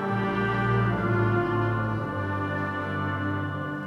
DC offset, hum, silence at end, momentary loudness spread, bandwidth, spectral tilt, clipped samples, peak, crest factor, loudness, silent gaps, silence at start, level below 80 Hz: under 0.1%; none; 0 s; 5 LU; 6.2 kHz; -8.5 dB/octave; under 0.1%; -12 dBFS; 14 dB; -27 LUFS; none; 0 s; -48 dBFS